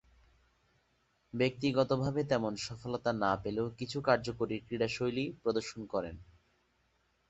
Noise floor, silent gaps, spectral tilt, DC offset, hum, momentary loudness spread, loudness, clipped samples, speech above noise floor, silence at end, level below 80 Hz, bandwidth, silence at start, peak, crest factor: -75 dBFS; none; -6 dB/octave; under 0.1%; none; 8 LU; -34 LUFS; under 0.1%; 41 dB; 1.05 s; -62 dBFS; 8.4 kHz; 1.35 s; -12 dBFS; 24 dB